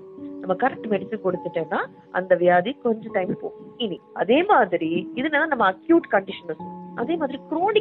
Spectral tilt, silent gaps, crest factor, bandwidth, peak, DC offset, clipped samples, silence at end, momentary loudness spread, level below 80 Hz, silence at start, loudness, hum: -9.5 dB/octave; none; 18 dB; 4.2 kHz; -6 dBFS; under 0.1%; under 0.1%; 0 s; 14 LU; -64 dBFS; 0 s; -23 LUFS; none